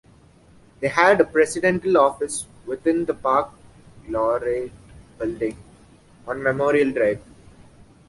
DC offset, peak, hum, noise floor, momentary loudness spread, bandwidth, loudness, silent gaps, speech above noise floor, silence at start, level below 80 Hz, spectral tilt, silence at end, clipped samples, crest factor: under 0.1%; -2 dBFS; none; -52 dBFS; 14 LU; 11.5 kHz; -21 LUFS; none; 31 dB; 0.8 s; -52 dBFS; -5 dB/octave; 0.9 s; under 0.1%; 22 dB